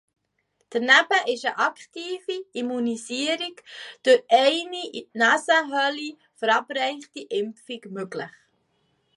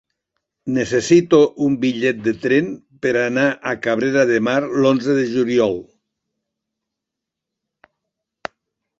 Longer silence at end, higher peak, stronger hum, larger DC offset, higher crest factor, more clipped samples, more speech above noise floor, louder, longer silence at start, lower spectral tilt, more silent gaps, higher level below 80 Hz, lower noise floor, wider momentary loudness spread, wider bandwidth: second, 0.85 s vs 3.15 s; about the same, -4 dBFS vs -2 dBFS; neither; neither; about the same, 22 dB vs 18 dB; neither; second, 48 dB vs 66 dB; second, -23 LUFS vs -18 LUFS; about the same, 0.7 s vs 0.65 s; second, -2 dB/octave vs -5.5 dB/octave; neither; second, -82 dBFS vs -58 dBFS; second, -72 dBFS vs -83 dBFS; first, 18 LU vs 14 LU; first, 11.5 kHz vs 8 kHz